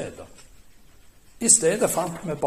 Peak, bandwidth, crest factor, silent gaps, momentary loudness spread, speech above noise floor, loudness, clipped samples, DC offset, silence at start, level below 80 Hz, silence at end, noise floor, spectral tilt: -2 dBFS; 15.5 kHz; 24 dB; none; 13 LU; 29 dB; -20 LUFS; under 0.1%; under 0.1%; 0 s; -54 dBFS; 0 s; -50 dBFS; -2.5 dB/octave